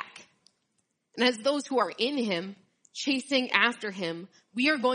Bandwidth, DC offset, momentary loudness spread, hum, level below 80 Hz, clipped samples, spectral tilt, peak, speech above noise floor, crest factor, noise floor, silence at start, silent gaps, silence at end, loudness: 10 kHz; under 0.1%; 18 LU; none; -82 dBFS; under 0.1%; -3.5 dB/octave; -6 dBFS; 49 dB; 24 dB; -77 dBFS; 0 s; none; 0 s; -27 LUFS